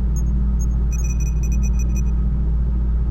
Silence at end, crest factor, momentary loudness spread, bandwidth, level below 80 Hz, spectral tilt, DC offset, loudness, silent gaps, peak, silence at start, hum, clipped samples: 0 s; 8 dB; 1 LU; 7 kHz; -18 dBFS; -7.5 dB/octave; under 0.1%; -21 LUFS; none; -10 dBFS; 0 s; none; under 0.1%